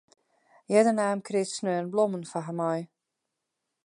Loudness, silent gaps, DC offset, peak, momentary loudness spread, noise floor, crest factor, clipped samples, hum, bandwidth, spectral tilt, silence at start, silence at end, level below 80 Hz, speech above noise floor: -27 LUFS; none; under 0.1%; -10 dBFS; 11 LU; -84 dBFS; 20 dB; under 0.1%; none; 11 kHz; -5.5 dB/octave; 0.7 s; 1 s; -82 dBFS; 57 dB